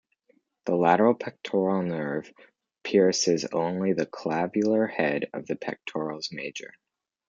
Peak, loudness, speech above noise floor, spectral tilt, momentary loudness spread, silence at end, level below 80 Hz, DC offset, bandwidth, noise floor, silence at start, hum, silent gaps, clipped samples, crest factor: -6 dBFS; -26 LUFS; 42 dB; -5 dB/octave; 13 LU; 0.6 s; -72 dBFS; under 0.1%; 9.2 kHz; -67 dBFS; 0.65 s; none; none; under 0.1%; 20 dB